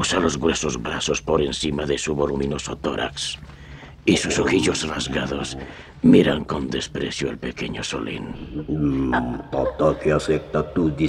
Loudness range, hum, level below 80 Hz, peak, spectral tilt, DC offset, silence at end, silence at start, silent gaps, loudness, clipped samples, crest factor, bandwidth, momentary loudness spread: 4 LU; none; -40 dBFS; -4 dBFS; -4.5 dB/octave; under 0.1%; 0 s; 0 s; none; -22 LUFS; under 0.1%; 20 dB; 12 kHz; 10 LU